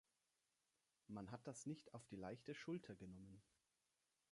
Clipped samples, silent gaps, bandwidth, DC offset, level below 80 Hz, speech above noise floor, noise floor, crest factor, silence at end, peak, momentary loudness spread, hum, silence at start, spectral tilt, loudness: under 0.1%; none; 11 kHz; under 0.1%; -82 dBFS; 35 dB; -89 dBFS; 18 dB; 0.9 s; -40 dBFS; 8 LU; none; 1.1 s; -5.5 dB/octave; -55 LUFS